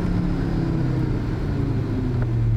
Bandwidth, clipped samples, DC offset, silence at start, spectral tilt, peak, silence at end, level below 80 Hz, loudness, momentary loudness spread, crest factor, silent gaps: 7.8 kHz; under 0.1%; 0.1%; 0 s; -9 dB/octave; -12 dBFS; 0 s; -30 dBFS; -24 LUFS; 2 LU; 10 dB; none